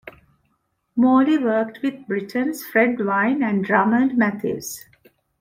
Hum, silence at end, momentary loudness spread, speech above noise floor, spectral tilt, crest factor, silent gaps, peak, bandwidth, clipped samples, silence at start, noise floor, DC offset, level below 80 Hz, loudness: none; 0.6 s; 11 LU; 50 dB; -6 dB/octave; 18 dB; none; -2 dBFS; 16.5 kHz; under 0.1%; 0.05 s; -70 dBFS; under 0.1%; -64 dBFS; -20 LUFS